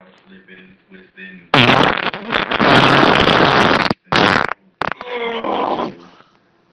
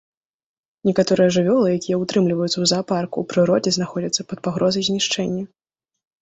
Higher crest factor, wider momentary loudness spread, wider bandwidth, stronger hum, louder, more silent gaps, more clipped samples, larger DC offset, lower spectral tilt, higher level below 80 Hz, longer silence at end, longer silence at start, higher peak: about the same, 16 dB vs 16 dB; first, 13 LU vs 7 LU; first, 12.5 kHz vs 8.4 kHz; neither; first, -14 LUFS vs -20 LUFS; neither; neither; neither; about the same, -5 dB/octave vs -5 dB/octave; first, -42 dBFS vs -58 dBFS; about the same, 0.8 s vs 0.75 s; second, 0.5 s vs 0.85 s; first, 0 dBFS vs -4 dBFS